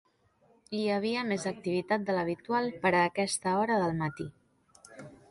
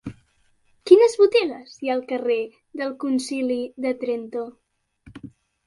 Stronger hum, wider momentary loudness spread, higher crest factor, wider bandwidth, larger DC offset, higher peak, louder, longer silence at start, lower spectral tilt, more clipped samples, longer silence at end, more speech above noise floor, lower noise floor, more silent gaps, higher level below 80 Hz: neither; second, 15 LU vs 22 LU; about the same, 18 dB vs 22 dB; about the same, 11.5 kHz vs 11.5 kHz; neither; second, -14 dBFS vs -2 dBFS; second, -30 LUFS vs -21 LUFS; first, 0.7 s vs 0.05 s; about the same, -5 dB/octave vs -4.5 dB/octave; neither; second, 0.15 s vs 0.4 s; about the same, 37 dB vs 39 dB; first, -67 dBFS vs -63 dBFS; neither; about the same, -66 dBFS vs -62 dBFS